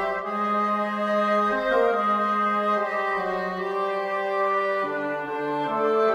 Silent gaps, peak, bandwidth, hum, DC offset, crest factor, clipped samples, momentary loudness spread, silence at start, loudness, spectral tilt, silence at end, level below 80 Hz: none; -8 dBFS; 15 kHz; none; under 0.1%; 16 dB; under 0.1%; 6 LU; 0 s; -24 LUFS; -6 dB/octave; 0 s; -62 dBFS